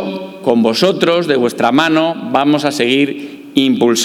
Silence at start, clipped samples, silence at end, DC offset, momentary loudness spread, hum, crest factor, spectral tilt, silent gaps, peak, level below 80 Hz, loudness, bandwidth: 0 s; under 0.1%; 0 s; under 0.1%; 7 LU; none; 14 dB; -4.5 dB/octave; none; 0 dBFS; -60 dBFS; -13 LUFS; 16.5 kHz